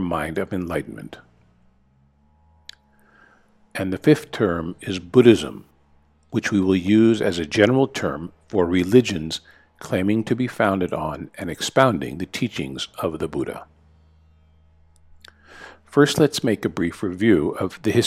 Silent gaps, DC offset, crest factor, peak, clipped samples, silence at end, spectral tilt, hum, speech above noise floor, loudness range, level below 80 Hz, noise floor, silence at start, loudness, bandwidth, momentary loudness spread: none; under 0.1%; 22 dB; 0 dBFS; under 0.1%; 0 s; -6 dB/octave; none; 39 dB; 11 LU; -52 dBFS; -59 dBFS; 0 s; -21 LUFS; 15.5 kHz; 15 LU